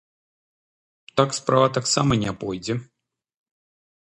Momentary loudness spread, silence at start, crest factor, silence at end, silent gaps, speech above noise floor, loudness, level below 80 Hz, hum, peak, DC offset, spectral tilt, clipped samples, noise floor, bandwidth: 10 LU; 1.15 s; 22 dB; 1.2 s; none; over 69 dB; -22 LUFS; -52 dBFS; none; -2 dBFS; under 0.1%; -4.5 dB/octave; under 0.1%; under -90 dBFS; 11.5 kHz